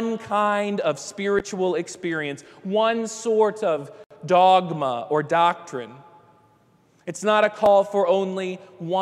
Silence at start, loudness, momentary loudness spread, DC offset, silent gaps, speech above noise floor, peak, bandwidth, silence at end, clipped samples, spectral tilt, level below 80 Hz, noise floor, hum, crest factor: 0 s; -22 LUFS; 17 LU; under 0.1%; 4.06-4.10 s; 37 dB; -4 dBFS; 12.5 kHz; 0 s; under 0.1%; -4.5 dB/octave; -64 dBFS; -59 dBFS; none; 18 dB